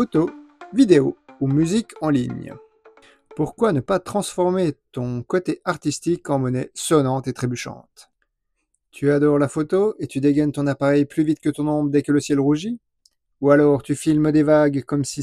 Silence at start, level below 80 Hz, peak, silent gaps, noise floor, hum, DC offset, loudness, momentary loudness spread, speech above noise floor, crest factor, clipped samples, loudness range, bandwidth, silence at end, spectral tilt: 0 s; -54 dBFS; -2 dBFS; none; -74 dBFS; none; under 0.1%; -20 LUFS; 11 LU; 55 dB; 18 dB; under 0.1%; 4 LU; 13.5 kHz; 0 s; -6.5 dB/octave